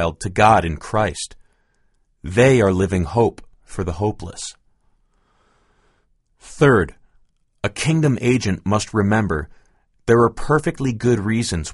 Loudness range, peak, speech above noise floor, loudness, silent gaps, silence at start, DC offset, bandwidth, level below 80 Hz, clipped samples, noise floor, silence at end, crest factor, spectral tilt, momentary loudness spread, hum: 6 LU; 0 dBFS; 45 dB; -19 LUFS; none; 0 s; under 0.1%; 11.5 kHz; -40 dBFS; under 0.1%; -62 dBFS; 0 s; 20 dB; -6 dB/octave; 16 LU; none